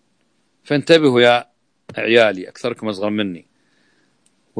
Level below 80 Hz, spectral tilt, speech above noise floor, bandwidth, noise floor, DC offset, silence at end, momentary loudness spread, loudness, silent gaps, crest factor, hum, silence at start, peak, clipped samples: -68 dBFS; -5.5 dB/octave; 49 dB; 10.5 kHz; -65 dBFS; under 0.1%; 1.2 s; 13 LU; -16 LUFS; none; 18 dB; none; 0.7 s; 0 dBFS; under 0.1%